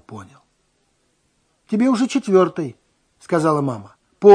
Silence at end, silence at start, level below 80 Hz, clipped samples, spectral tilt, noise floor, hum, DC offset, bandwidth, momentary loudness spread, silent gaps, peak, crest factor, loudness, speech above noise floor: 0 s; 0.1 s; -68 dBFS; 0.2%; -6.5 dB/octave; -65 dBFS; none; under 0.1%; 10.5 kHz; 16 LU; none; 0 dBFS; 18 dB; -19 LUFS; 47 dB